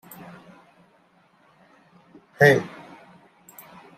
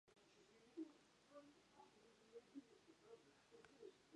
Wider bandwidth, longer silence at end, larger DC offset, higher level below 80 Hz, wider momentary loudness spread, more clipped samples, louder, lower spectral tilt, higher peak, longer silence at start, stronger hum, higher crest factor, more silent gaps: first, 15.5 kHz vs 10.5 kHz; first, 1.3 s vs 0 s; neither; first, -68 dBFS vs under -90 dBFS; first, 29 LU vs 10 LU; neither; first, -19 LUFS vs -64 LUFS; first, -6 dB/octave vs -4.5 dB/octave; first, -2 dBFS vs -44 dBFS; first, 2.4 s vs 0.05 s; neither; first, 26 dB vs 20 dB; neither